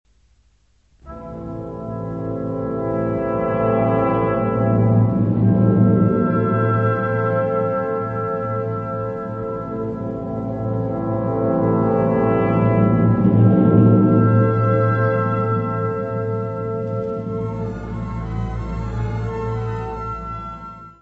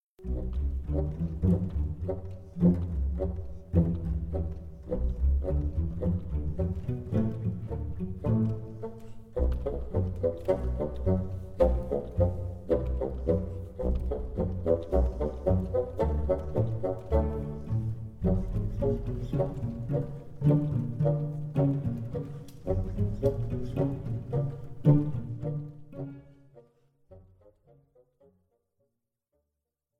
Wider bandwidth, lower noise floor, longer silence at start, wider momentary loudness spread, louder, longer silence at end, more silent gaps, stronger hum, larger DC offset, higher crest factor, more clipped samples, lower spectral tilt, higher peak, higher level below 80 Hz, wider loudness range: second, 3.6 kHz vs 5.8 kHz; second, -59 dBFS vs -85 dBFS; first, 1.05 s vs 0.2 s; first, 13 LU vs 10 LU; first, -19 LUFS vs -31 LUFS; second, 0.1 s vs 2.8 s; neither; neither; neither; about the same, 18 dB vs 20 dB; neither; about the same, -11 dB/octave vs -11 dB/octave; first, -2 dBFS vs -10 dBFS; about the same, -40 dBFS vs -36 dBFS; first, 10 LU vs 3 LU